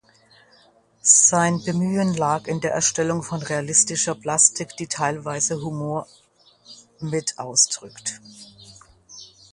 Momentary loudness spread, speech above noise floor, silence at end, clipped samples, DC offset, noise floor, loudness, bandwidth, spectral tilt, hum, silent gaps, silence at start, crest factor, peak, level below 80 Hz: 15 LU; 35 dB; 0.3 s; under 0.1%; under 0.1%; -56 dBFS; -20 LUFS; 11.5 kHz; -3 dB/octave; none; none; 1.05 s; 24 dB; 0 dBFS; -62 dBFS